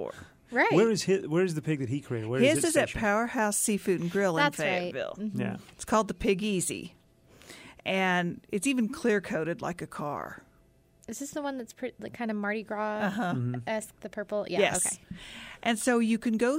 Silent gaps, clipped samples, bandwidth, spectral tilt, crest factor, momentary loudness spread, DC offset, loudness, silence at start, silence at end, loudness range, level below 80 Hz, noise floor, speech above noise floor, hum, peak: none; under 0.1%; 16 kHz; -4.5 dB/octave; 18 dB; 14 LU; under 0.1%; -29 LUFS; 0 s; 0 s; 7 LU; -58 dBFS; -62 dBFS; 33 dB; none; -10 dBFS